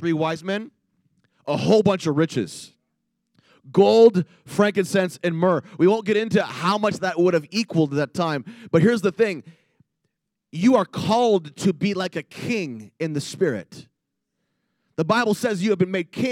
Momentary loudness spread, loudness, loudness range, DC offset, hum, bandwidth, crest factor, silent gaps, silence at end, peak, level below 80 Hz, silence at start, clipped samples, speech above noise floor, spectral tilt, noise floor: 11 LU; -21 LUFS; 6 LU; under 0.1%; none; 15.5 kHz; 20 dB; none; 0 s; -2 dBFS; -68 dBFS; 0 s; under 0.1%; 58 dB; -6 dB/octave; -79 dBFS